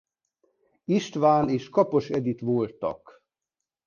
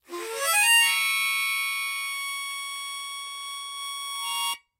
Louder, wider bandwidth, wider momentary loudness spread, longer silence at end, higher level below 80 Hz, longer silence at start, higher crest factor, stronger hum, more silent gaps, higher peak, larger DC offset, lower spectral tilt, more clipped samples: about the same, -25 LUFS vs -24 LUFS; second, 7.2 kHz vs 16 kHz; second, 11 LU vs 16 LU; first, 0.9 s vs 0.2 s; first, -62 dBFS vs -84 dBFS; first, 0.9 s vs 0.1 s; about the same, 20 dB vs 18 dB; neither; neither; about the same, -8 dBFS vs -10 dBFS; neither; first, -7 dB/octave vs 3.5 dB/octave; neither